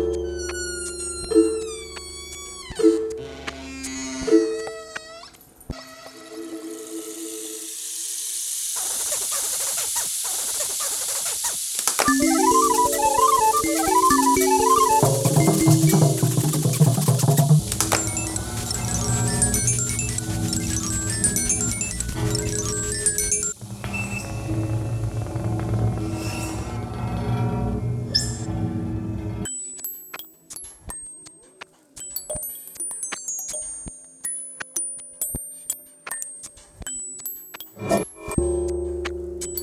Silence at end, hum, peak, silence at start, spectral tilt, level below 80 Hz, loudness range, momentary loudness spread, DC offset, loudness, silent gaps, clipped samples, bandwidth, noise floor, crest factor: 0 s; none; -2 dBFS; 0 s; -4 dB/octave; -40 dBFS; 13 LU; 17 LU; under 0.1%; -22 LUFS; none; under 0.1%; 18 kHz; -47 dBFS; 22 dB